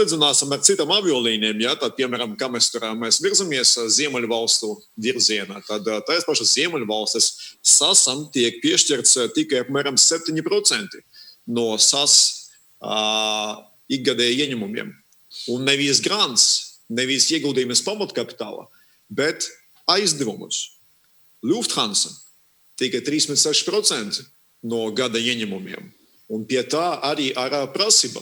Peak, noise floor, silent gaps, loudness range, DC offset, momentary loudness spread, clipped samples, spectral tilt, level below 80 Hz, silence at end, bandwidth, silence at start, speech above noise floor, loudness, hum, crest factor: 0 dBFS; -57 dBFS; none; 7 LU; under 0.1%; 14 LU; under 0.1%; -1.5 dB/octave; -76 dBFS; 0 s; over 20 kHz; 0 s; 37 dB; -19 LUFS; none; 22 dB